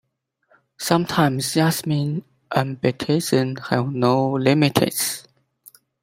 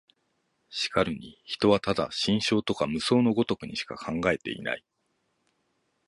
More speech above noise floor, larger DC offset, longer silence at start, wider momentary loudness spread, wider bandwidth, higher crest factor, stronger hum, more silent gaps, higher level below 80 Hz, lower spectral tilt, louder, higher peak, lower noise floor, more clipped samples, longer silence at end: about the same, 45 dB vs 48 dB; neither; about the same, 0.8 s vs 0.7 s; second, 7 LU vs 11 LU; first, 16 kHz vs 11.5 kHz; about the same, 20 dB vs 20 dB; neither; neither; about the same, -58 dBFS vs -56 dBFS; about the same, -5 dB/octave vs -5 dB/octave; first, -21 LUFS vs -27 LUFS; first, 0 dBFS vs -8 dBFS; second, -65 dBFS vs -75 dBFS; neither; second, 0.8 s vs 1.3 s